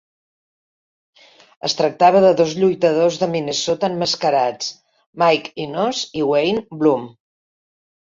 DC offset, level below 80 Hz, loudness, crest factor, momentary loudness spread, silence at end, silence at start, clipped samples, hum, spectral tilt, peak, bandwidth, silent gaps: under 0.1%; -62 dBFS; -18 LUFS; 18 dB; 10 LU; 1.1 s; 1.65 s; under 0.1%; none; -4.5 dB/octave; -2 dBFS; 7.8 kHz; 5.06-5.13 s